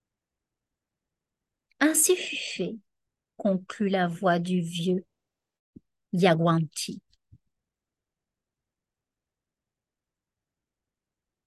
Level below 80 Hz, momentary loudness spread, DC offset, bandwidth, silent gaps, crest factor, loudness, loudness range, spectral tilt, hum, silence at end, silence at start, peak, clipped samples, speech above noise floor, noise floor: -74 dBFS; 12 LU; under 0.1%; 13 kHz; 5.59-5.73 s; 24 dB; -26 LUFS; 3 LU; -4.5 dB/octave; none; 4.45 s; 1.8 s; -6 dBFS; under 0.1%; 64 dB; -89 dBFS